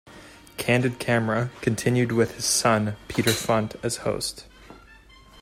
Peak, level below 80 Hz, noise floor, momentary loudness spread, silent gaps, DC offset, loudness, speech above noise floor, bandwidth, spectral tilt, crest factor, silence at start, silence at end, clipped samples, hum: -6 dBFS; -52 dBFS; -50 dBFS; 8 LU; none; under 0.1%; -24 LUFS; 27 dB; 16 kHz; -4.5 dB/octave; 20 dB; 0.05 s; 0.45 s; under 0.1%; none